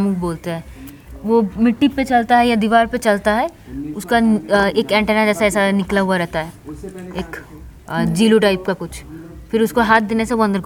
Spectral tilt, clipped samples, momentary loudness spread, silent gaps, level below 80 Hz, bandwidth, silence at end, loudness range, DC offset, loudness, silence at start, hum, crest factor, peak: -5.5 dB/octave; under 0.1%; 17 LU; none; -40 dBFS; 17.5 kHz; 0 s; 4 LU; under 0.1%; -16 LUFS; 0 s; none; 16 dB; 0 dBFS